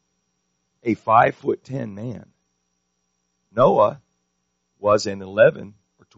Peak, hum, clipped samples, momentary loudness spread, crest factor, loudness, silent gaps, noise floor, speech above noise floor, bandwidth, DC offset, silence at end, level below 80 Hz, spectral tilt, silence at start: -2 dBFS; none; under 0.1%; 16 LU; 20 dB; -20 LUFS; none; -73 dBFS; 54 dB; 7.6 kHz; under 0.1%; 0.5 s; -62 dBFS; -5 dB/octave; 0.85 s